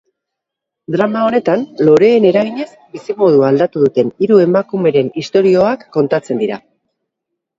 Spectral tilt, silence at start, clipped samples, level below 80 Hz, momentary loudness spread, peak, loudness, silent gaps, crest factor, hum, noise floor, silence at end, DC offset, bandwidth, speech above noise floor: -7.5 dB/octave; 0.9 s; under 0.1%; -58 dBFS; 11 LU; 0 dBFS; -13 LUFS; none; 14 dB; none; -80 dBFS; 1 s; under 0.1%; 7.8 kHz; 68 dB